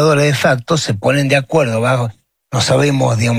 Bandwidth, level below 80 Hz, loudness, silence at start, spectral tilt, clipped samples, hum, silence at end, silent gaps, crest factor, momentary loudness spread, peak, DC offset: 16 kHz; -52 dBFS; -14 LUFS; 0 s; -5 dB/octave; under 0.1%; none; 0 s; none; 12 dB; 5 LU; -2 dBFS; under 0.1%